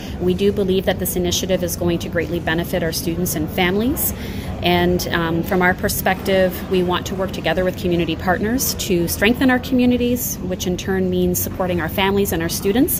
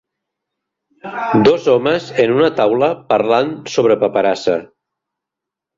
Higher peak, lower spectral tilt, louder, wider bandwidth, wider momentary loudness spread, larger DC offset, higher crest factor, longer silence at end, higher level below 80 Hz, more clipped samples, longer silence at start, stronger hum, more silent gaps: about the same, -2 dBFS vs 0 dBFS; second, -4.5 dB/octave vs -6 dB/octave; second, -19 LUFS vs -15 LUFS; first, 16 kHz vs 7.6 kHz; second, 5 LU vs 8 LU; neither; about the same, 16 dB vs 16 dB; second, 0 s vs 1.1 s; first, -34 dBFS vs -54 dBFS; neither; second, 0 s vs 1.05 s; neither; neither